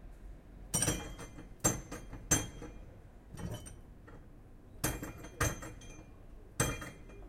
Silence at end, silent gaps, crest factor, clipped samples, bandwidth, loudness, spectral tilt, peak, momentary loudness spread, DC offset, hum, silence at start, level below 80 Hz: 0 s; none; 26 dB; under 0.1%; 16.5 kHz; -36 LUFS; -3 dB/octave; -14 dBFS; 23 LU; under 0.1%; none; 0 s; -50 dBFS